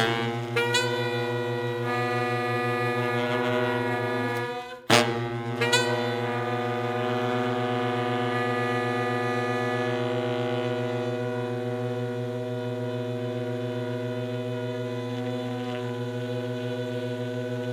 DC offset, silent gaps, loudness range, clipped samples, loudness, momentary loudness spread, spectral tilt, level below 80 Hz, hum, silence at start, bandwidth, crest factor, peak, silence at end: under 0.1%; none; 6 LU; under 0.1%; -28 LUFS; 7 LU; -5 dB/octave; -70 dBFS; none; 0 s; 16.5 kHz; 24 dB; -4 dBFS; 0 s